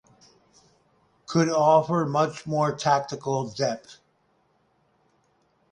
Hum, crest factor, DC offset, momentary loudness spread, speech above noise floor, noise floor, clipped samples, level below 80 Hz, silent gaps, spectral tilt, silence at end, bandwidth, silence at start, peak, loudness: none; 20 dB; under 0.1%; 9 LU; 44 dB; -67 dBFS; under 0.1%; -66 dBFS; none; -5.5 dB/octave; 1.8 s; 10.5 kHz; 1.3 s; -6 dBFS; -24 LUFS